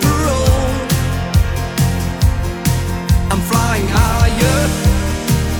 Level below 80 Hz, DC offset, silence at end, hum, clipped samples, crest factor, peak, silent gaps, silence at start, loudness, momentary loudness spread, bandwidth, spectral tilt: -20 dBFS; under 0.1%; 0 s; none; under 0.1%; 14 dB; 0 dBFS; none; 0 s; -16 LUFS; 4 LU; over 20 kHz; -5 dB/octave